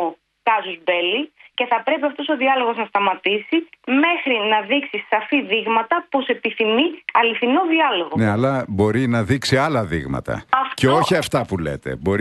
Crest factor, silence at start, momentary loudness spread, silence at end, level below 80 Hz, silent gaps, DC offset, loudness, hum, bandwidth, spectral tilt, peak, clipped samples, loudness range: 16 dB; 0 s; 7 LU; 0 s; -48 dBFS; none; under 0.1%; -19 LUFS; none; 12 kHz; -5.5 dB/octave; -2 dBFS; under 0.1%; 2 LU